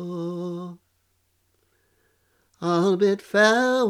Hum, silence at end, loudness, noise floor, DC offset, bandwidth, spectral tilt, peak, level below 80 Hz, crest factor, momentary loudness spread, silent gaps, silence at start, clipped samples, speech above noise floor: none; 0 s; -22 LUFS; -69 dBFS; under 0.1%; 15 kHz; -5 dB/octave; -6 dBFS; -74 dBFS; 18 dB; 16 LU; none; 0 s; under 0.1%; 49 dB